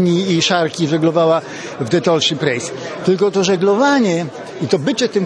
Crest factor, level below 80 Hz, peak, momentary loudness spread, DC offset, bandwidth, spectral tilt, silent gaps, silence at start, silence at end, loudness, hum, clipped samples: 14 dB; -60 dBFS; 0 dBFS; 9 LU; under 0.1%; 10.5 kHz; -5 dB/octave; none; 0 s; 0 s; -16 LUFS; none; under 0.1%